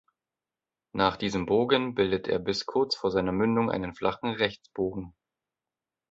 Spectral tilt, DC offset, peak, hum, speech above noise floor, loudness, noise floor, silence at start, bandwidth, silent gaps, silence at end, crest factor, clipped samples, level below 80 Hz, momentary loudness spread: -5.5 dB/octave; under 0.1%; -8 dBFS; none; over 63 dB; -28 LUFS; under -90 dBFS; 0.95 s; 8 kHz; none; 1 s; 22 dB; under 0.1%; -56 dBFS; 7 LU